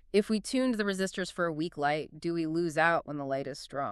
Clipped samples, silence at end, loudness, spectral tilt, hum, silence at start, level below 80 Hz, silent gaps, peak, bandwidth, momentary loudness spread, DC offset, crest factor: under 0.1%; 0 s; -31 LUFS; -5 dB/octave; none; 0.15 s; -62 dBFS; none; -12 dBFS; 13 kHz; 8 LU; under 0.1%; 20 dB